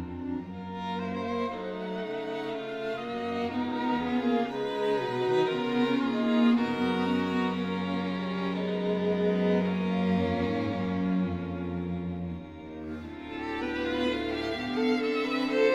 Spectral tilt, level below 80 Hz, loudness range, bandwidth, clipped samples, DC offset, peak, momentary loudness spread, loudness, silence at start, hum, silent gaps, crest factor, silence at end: -7 dB/octave; -56 dBFS; 6 LU; 8.8 kHz; under 0.1%; under 0.1%; -14 dBFS; 9 LU; -30 LUFS; 0 s; none; none; 16 dB; 0 s